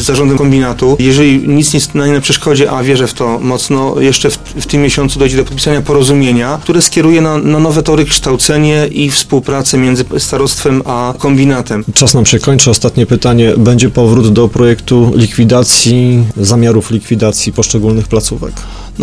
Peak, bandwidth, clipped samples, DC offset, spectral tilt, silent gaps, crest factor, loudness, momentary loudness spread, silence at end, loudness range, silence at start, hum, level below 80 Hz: 0 dBFS; 11 kHz; 0.6%; under 0.1%; -4.5 dB/octave; none; 8 dB; -9 LUFS; 6 LU; 0 s; 3 LU; 0 s; none; -28 dBFS